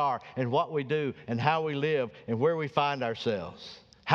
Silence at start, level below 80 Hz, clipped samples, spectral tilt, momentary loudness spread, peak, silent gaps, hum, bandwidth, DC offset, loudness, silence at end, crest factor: 0 s; -68 dBFS; under 0.1%; -7 dB/octave; 10 LU; -4 dBFS; none; none; 7.2 kHz; under 0.1%; -30 LUFS; 0 s; 24 dB